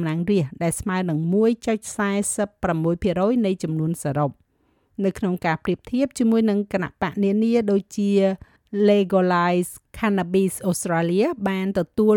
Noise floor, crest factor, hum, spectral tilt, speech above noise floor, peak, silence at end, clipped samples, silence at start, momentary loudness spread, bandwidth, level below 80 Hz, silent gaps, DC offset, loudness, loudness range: -65 dBFS; 14 dB; none; -6 dB/octave; 44 dB; -8 dBFS; 0 s; under 0.1%; 0 s; 6 LU; 18 kHz; -50 dBFS; none; under 0.1%; -22 LUFS; 3 LU